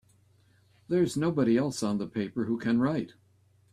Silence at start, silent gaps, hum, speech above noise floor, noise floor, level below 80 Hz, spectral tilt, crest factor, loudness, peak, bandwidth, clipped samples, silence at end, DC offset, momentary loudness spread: 0.9 s; none; none; 37 dB; -64 dBFS; -66 dBFS; -6.5 dB/octave; 16 dB; -29 LUFS; -14 dBFS; 13.5 kHz; under 0.1%; 0.65 s; under 0.1%; 7 LU